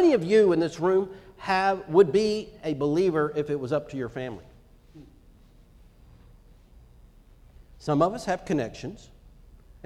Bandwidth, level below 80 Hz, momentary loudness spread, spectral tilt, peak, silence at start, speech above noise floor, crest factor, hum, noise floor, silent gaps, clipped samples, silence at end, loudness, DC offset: 11.5 kHz; -54 dBFS; 17 LU; -6.5 dB/octave; -6 dBFS; 0 s; 29 dB; 20 dB; none; -54 dBFS; none; under 0.1%; 0.9 s; -25 LUFS; under 0.1%